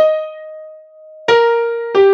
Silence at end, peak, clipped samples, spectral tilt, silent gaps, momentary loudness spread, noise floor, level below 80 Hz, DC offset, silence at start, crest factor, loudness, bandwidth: 0 s; 0 dBFS; under 0.1%; -4 dB/octave; none; 20 LU; -39 dBFS; -66 dBFS; under 0.1%; 0 s; 14 dB; -15 LUFS; 7.4 kHz